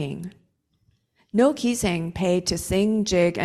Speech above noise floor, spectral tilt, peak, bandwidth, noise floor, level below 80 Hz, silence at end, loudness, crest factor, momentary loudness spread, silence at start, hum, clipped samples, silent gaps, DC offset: 44 dB; -5 dB/octave; -6 dBFS; 14 kHz; -67 dBFS; -46 dBFS; 0 s; -23 LUFS; 18 dB; 10 LU; 0 s; none; under 0.1%; none; under 0.1%